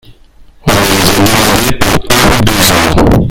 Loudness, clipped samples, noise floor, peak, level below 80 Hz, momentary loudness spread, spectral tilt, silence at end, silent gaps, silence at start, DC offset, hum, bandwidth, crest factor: -8 LUFS; 3%; -37 dBFS; 0 dBFS; -20 dBFS; 4 LU; -4 dB/octave; 0 s; none; 0.1 s; under 0.1%; none; over 20 kHz; 8 dB